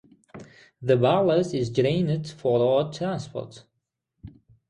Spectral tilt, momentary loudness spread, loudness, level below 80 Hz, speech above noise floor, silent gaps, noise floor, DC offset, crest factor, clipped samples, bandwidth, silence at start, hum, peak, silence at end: -7 dB/octave; 13 LU; -24 LUFS; -60 dBFS; 57 dB; none; -80 dBFS; under 0.1%; 18 dB; under 0.1%; 10.5 kHz; 0.35 s; none; -8 dBFS; 0.4 s